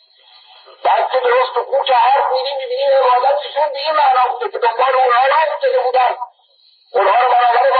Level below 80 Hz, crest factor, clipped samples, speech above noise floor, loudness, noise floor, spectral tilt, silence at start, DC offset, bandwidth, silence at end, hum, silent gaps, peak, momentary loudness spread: -74 dBFS; 12 dB; under 0.1%; 39 dB; -14 LUFS; -53 dBFS; -5 dB/octave; 0.85 s; under 0.1%; 5 kHz; 0 s; none; none; -4 dBFS; 7 LU